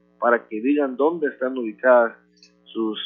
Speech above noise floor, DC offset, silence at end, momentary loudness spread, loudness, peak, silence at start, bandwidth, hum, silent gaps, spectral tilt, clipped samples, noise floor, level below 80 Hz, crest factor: 31 dB; under 0.1%; 0 s; 10 LU; -21 LUFS; -4 dBFS; 0.2 s; 5.8 kHz; 60 Hz at -50 dBFS; none; -7 dB/octave; under 0.1%; -51 dBFS; -80 dBFS; 18 dB